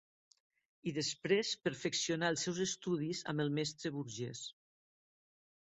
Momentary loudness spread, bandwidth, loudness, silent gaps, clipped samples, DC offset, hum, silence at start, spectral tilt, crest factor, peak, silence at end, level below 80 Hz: 9 LU; 8.2 kHz; -37 LUFS; none; under 0.1%; under 0.1%; none; 0.85 s; -4 dB/octave; 22 dB; -18 dBFS; 1.25 s; -76 dBFS